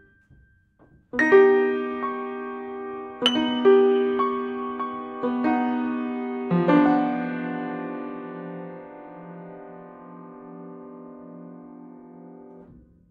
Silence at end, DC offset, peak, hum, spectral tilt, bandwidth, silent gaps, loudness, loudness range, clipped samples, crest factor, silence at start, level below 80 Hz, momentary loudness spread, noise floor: 0.4 s; under 0.1%; -4 dBFS; none; -6.5 dB/octave; 6.4 kHz; none; -23 LUFS; 21 LU; under 0.1%; 20 dB; 1.15 s; -66 dBFS; 25 LU; -58 dBFS